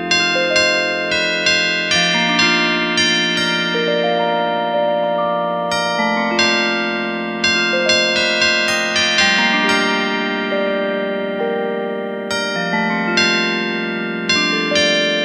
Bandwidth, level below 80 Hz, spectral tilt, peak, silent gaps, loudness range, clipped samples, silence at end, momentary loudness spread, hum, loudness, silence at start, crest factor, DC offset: 14.5 kHz; -54 dBFS; -2.5 dB/octave; 0 dBFS; none; 4 LU; under 0.1%; 0 s; 7 LU; none; -15 LUFS; 0 s; 16 dB; under 0.1%